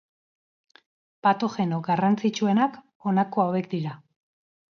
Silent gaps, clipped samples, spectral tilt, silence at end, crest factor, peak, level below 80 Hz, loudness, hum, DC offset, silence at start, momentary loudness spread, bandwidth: 2.95-3.00 s; under 0.1%; -7 dB/octave; 0.75 s; 18 dB; -8 dBFS; -72 dBFS; -25 LUFS; none; under 0.1%; 1.25 s; 8 LU; 7 kHz